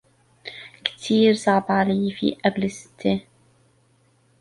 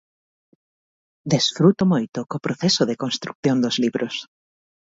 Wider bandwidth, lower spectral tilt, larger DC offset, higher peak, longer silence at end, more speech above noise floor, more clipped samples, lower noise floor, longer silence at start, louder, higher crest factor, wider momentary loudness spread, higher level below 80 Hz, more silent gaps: first, 11.5 kHz vs 7.8 kHz; about the same, -5.5 dB/octave vs -5 dB/octave; neither; about the same, -2 dBFS vs -2 dBFS; first, 1.2 s vs 0.7 s; second, 40 dB vs over 69 dB; neither; second, -61 dBFS vs under -90 dBFS; second, 0.45 s vs 1.25 s; about the same, -22 LUFS vs -21 LUFS; about the same, 20 dB vs 20 dB; first, 20 LU vs 11 LU; about the same, -60 dBFS vs -62 dBFS; second, none vs 3.35-3.43 s